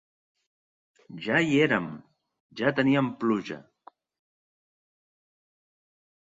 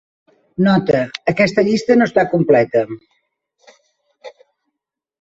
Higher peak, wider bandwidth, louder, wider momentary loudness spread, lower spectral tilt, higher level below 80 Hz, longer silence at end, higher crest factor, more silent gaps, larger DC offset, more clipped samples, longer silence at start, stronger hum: second, -8 dBFS vs 0 dBFS; about the same, 7.8 kHz vs 8 kHz; second, -25 LUFS vs -15 LUFS; first, 21 LU vs 9 LU; about the same, -6.5 dB/octave vs -7 dB/octave; second, -68 dBFS vs -54 dBFS; first, 2.7 s vs 0.95 s; first, 22 dB vs 16 dB; first, 2.40-2.49 s vs none; neither; neither; first, 1.1 s vs 0.6 s; neither